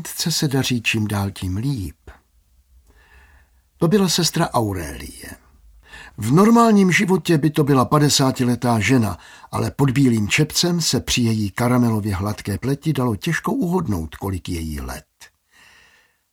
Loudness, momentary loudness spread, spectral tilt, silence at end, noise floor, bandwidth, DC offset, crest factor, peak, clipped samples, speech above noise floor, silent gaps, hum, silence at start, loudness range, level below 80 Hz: -19 LUFS; 14 LU; -5 dB/octave; 1.1 s; -58 dBFS; 17.5 kHz; under 0.1%; 18 dB; -2 dBFS; under 0.1%; 39 dB; none; none; 0 s; 8 LU; -42 dBFS